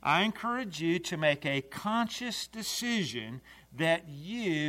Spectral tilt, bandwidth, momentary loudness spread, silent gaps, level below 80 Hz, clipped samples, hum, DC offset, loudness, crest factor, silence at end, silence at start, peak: -4 dB/octave; 16 kHz; 11 LU; none; -66 dBFS; under 0.1%; none; under 0.1%; -32 LUFS; 20 dB; 0 s; 0.05 s; -12 dBFS